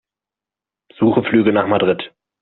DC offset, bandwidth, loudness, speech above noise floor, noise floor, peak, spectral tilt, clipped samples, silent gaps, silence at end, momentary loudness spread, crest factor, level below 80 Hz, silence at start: under 0.1%; 4.2 kHz; -16 LUFS; 73 dB; -88 dBFS; -2 dBFS; -5 dB/octave; under 0.1%; none; 0.35 s; 8 LU; 16 dB; -58 dBFS; 1 s